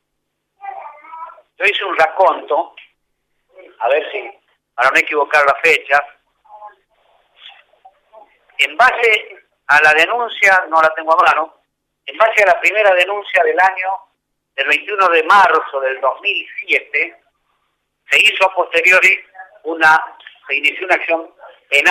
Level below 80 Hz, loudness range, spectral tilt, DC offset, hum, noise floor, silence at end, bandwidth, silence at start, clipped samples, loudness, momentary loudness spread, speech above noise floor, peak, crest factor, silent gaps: -62 dBFS; 6 LU; -1 dB/octave; under 0.1%; none; -73 dBFS; 0 s; 16 kHz; 0.65 s; under 0.1%; -13 LUFS; 20 LU; 59 dB; -2 dBFS; 14 dB; none